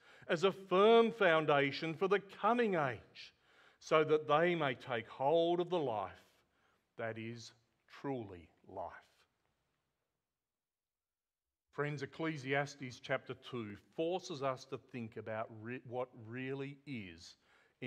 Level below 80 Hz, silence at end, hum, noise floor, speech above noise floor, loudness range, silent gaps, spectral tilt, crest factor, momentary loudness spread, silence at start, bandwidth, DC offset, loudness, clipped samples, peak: -80 dBFS; 0 s; none; under -90 dBFS; over 54 dB; 18 LU; none; -6 dB/octave; 22 dB; 18 LU; 0.25 s; 9.2 kHz; under 0.1%; -36 LUFS; under 0.1%; -16 dBFS